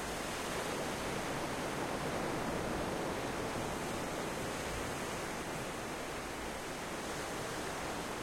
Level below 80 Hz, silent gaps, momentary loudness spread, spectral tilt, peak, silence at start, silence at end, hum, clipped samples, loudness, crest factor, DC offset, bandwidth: -54 dBFS; none; 3 LU; -4 dB/octave; -24 dBFS; 0 s; 0 s; none; under 0.1%; -39 LUFS; 14 dB; under 0.1%; 16.5 kHz